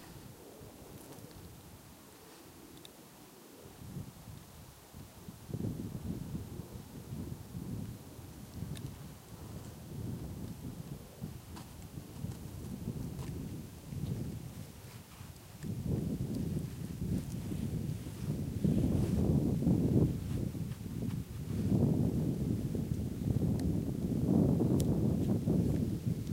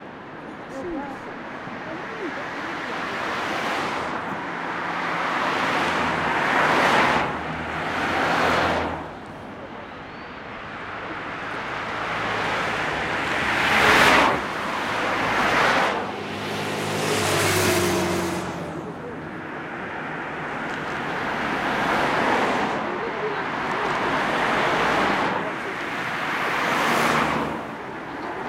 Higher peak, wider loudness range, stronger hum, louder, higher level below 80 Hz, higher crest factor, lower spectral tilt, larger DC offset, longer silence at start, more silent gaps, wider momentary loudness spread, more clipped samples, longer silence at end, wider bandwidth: second, -16 dBFS vs -2 dBFS; first, 18 LU vs 9 LU; neither; second, -36 LUFS vs -23 LUFS; about the same, -50 dBFS vs -50 dBFS; about the same, 20 dB vs 22 dB; first, -8 dB/octave vs -3.5 dB/octave; neither; about the same, 0 s vs 0 s; neither; first, 21 LU vs 14 LU; neither; about the same, 0 s vs 0 s; about the same, 16 kHz vs 16 kHz